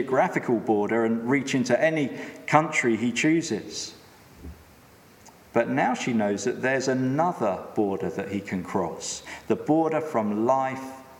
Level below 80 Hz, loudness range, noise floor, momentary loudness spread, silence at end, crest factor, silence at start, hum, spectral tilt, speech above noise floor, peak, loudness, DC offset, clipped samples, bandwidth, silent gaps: -60 dBFS; 4 LU; -53 dBFS; 10 LU; 0 s; 24 dB; 0 s; none; -5 dB/octave; 28 dB; -2 dBFS; -25 LUFS; under 0.1%; under 0.1%; 16.5 kHz; none